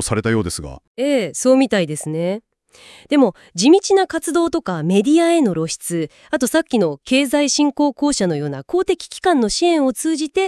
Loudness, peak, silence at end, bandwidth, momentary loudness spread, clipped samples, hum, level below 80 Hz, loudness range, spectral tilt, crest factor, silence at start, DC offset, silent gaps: -17 LUFS; -2 dBFS; 0 s; 12 kHz; 9 LU; under 0.1%; none; -48 dBFS; 2 LU; -4.5 dB/octave; 16 dB; 0 s; under 0.1%; 0.87-0.95 s